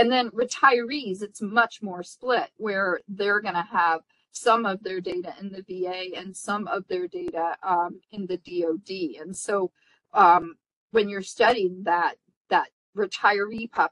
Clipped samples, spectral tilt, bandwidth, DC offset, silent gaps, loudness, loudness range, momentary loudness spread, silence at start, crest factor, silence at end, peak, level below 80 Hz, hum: under 0.1%; -3.5 dB/octave; 11.5 kHz; under 0.1%; 10.76-10.88 s, 12.36-12.45 s, 12.72-12.93 s; -25 LUFS; 6 LU; 13 LU; 0 s; 20 dB; 0 s; -4 dBFS; -70 dBFS; none